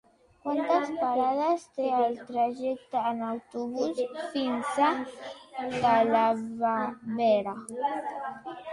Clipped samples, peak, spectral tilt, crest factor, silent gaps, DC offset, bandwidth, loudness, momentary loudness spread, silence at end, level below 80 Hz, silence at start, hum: under 0.1%; -12 dBFS; -5 dB/octave; 16 dB; none; under 0.1%; 11.5 kHz; -28 LUFS; 11 LU; 0 s; -70 dBFS; 0.45 s; none